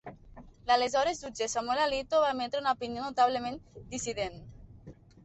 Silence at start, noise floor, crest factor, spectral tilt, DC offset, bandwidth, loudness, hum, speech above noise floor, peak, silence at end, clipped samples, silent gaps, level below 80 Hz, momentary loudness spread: 0.05 s; -52 dBFS; 18 dB; -3 dB/octave; under 0.1%; 8.4 kHz; -30 LUFS; none; 22 dB; -14 dBFS; 0.35 s; under 0.1%; none; -58 dBFS; 13 LU